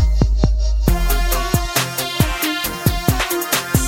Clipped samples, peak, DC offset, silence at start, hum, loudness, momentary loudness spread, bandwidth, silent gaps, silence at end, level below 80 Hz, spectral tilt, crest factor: under 0.1%; 0 dBFS; under 0.1%; 0 s; none; -18 LUFS; 2 LU; 17 kHz; none; 0 s; -20 dBFS; -4 dB/octave; 16 dB